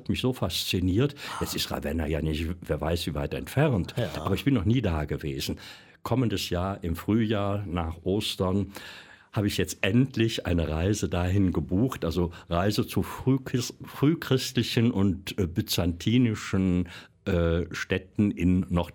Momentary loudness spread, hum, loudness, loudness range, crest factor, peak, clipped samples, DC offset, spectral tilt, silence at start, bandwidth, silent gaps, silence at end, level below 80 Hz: 7 LU; none; -27 LUFS; 2 LU; 18 dB; -10 dBFS; under 0.1%; under 0.1%; -6 dB/octave; 0 s; 17.5 kHz; none; 0.05 s; -44 dBFS